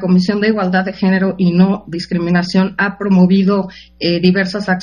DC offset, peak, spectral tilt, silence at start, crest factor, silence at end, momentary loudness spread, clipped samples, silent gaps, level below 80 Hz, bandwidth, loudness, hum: under 0.1%; 0 dBFS; -7.5 dB/octave; 0 s; 14 dB; 0 s; 8 LU; under 0.1%; none; -46 dBFS; 7.2 kHz; -14 LUFS; none